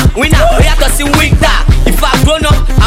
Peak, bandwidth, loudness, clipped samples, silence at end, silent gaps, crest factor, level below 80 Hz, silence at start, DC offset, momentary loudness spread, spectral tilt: 0 dBFS; 16 kHz; -9 LUFS; 2%; 0 s; none; 6 dB; -10 dBFS; 0 s; under 0.1%; 2 LU; -4.5 dB/octave